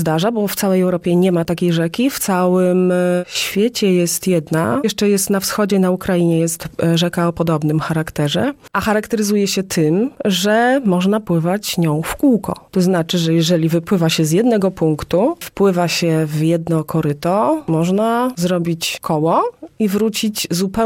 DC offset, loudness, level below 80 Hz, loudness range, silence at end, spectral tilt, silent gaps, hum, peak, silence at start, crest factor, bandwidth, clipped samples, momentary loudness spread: under 0.1%; -16 LUFS; -48 dBFS; 2 LU; 0 s; -5.5 dB/octave; none; none; -4 dBFS; 0 s; 12 dB; 17 kHz; under 0.1%; 4 LU